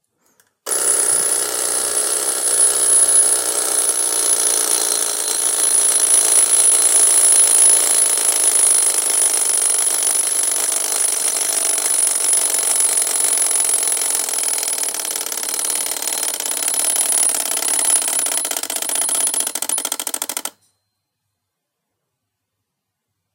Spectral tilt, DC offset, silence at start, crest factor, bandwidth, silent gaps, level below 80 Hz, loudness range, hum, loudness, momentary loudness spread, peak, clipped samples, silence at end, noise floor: 2.5 dB/octave; under 0.1%; 0.65 s; 18 dB; 17.5 kHz; none; -76 dBFS; 9 LU; none; -14 LUFS; 9 LU; 0 dBFS; under 0.1%; 2.85 s; -77 dBFS